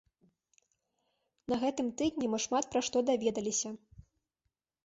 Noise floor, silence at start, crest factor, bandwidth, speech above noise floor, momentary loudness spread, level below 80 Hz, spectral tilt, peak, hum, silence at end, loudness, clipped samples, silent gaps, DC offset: -85 dBFS; 1.5 s; 18 dB; 8 kHz; 53 dB; 8 LU; -66 dBFS; -3 dB/octave; -18 dBFS; none; 0.85 s; -33 LUFS; under 0.1%; none; under 0.1%